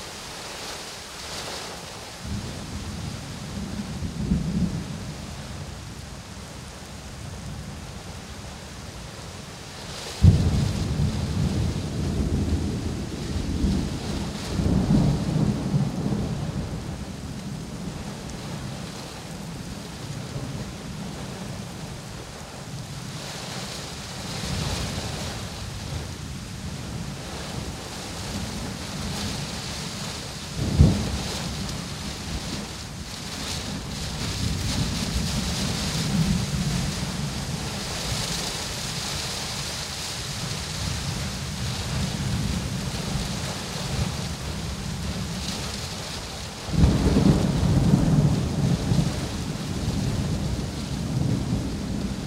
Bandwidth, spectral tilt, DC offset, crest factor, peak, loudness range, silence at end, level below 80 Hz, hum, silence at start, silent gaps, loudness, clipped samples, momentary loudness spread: 16 kHz; -5 dB/octave; under 0.1%; 24 dB; -4 dBFS; 11 LU; 0 s; -36 dBFS; none; 0 s; none; -28 LUFS; under 0.1%; 14 LU